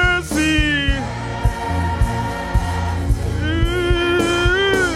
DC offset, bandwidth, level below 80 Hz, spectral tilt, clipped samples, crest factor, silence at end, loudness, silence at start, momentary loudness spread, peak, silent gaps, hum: under 0.1%; 15 kHz; -24 dBFS; -5 dB/octave; under 0.1%; 14 dB; 0 s; -19 LUFS; 0 s; 6 LU; -4 dBFS; none; none